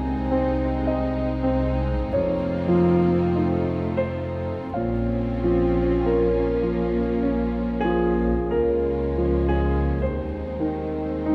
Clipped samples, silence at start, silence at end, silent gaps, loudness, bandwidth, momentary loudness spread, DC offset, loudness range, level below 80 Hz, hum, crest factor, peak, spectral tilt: under 0.1%; 0 s; 0 s; none; -23 LUFS; 5.6 kHz; 6 LU; under 0.1%; 1 LU; -30 dBFS; none; 12 dB; -10 dBFS; -10.5 dB/octave